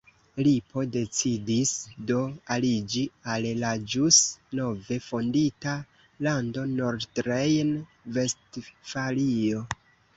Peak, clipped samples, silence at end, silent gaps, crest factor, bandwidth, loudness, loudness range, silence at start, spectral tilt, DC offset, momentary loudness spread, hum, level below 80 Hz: -4 dBFS; under 0.1%; 0.45 s; none; 22 dB; 8.2 kHz; -27 LUFS; 4 LU; 0.35 s; -4 dB/octave; under 0.1%; 9 LU; none; -58 dBFS